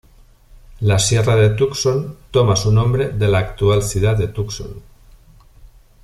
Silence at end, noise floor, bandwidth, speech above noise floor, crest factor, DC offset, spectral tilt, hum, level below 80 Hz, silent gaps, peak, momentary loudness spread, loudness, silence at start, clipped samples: 0.35 s; -47 dBFS; 13.5 kHz; 31 dB; 14 dB; under 0.1%; -5 dB/octave; none; -36 dBFS; none; -2 dBFS; 9 LU; -17 LUFS; 0.7 s; under 0.1%